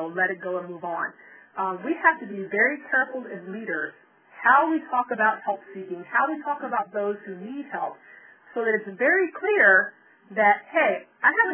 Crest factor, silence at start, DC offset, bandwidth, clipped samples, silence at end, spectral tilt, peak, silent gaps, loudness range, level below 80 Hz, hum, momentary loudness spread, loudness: 20 dB; 0 s; under 0.1%; 3.5 kHz; under 0.1%; 0 s; -8 dB/octave; -4 dBFS; none; 6 LU; -74 dBFS; none; 15 LU; -23 LUFS